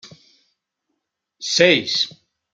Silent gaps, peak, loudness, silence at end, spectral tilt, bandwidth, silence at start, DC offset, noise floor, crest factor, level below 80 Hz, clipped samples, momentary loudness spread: none; -2 dBFS; -17 LUFS; 0.45 s; -2.5 dB/octave; 9.2 kHz; 0.05 s; under 0.1%; -77 dBFS; 22 dB; -68 dBFS; under 0.1%; 11 LU